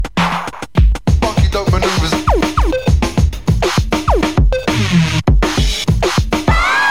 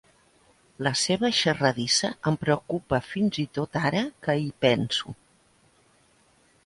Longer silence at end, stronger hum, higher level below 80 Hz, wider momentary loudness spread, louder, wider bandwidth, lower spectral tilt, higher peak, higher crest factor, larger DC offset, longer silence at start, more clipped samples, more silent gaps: second, 0 s vs 1.55 s; neither; first, -18 dBFS vs -58 dBFS; second, 3 LU vs 7 LU; first, -14 LUFS vs -25 LUFS; first, 16 kHz vs 11.5 kHz; first, -5.5 dB/octave vs -4 dB/octave; first, 0 dBFS vs -6 dBFS; second, 12 dB vs 20 dB; first, 2% vs under 0.1%; second, 0 s vs 0.8 s; neither; neither